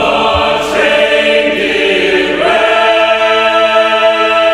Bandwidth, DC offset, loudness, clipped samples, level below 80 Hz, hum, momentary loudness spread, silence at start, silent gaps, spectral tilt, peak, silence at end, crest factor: 13.5 kHz; under 0.1%; -9 LUFS; under 0.1%; -36 dBFS; none; 2 LU; 0 s; none; -3.5 dB/octave; 0 dBFS; 0 s; 10 dB